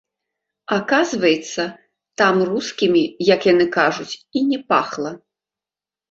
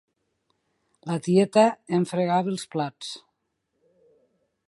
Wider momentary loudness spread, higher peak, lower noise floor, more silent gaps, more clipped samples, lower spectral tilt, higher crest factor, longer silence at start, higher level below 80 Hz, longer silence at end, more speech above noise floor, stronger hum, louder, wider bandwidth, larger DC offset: second, 12 LU vs 17 LU; first, -2 dBFS vs -6 dBFS; first, under -90 dBFS vs -77 dBFS; neither; neither; second, -4.5 dB/octave vs -6 dB/octave; about the same, 18 dB vs 22 dB; second, 0.7 s vs 1.05 s; first, -62 dBFS vs -74 dBFS; second, 0.95 s vs 1.5 s; first, over 72 dB vs 54 dB; neither; first, -18 LUFS vs -24 LUFS; second, 7.8 kHz vs 11.5 kHz; neither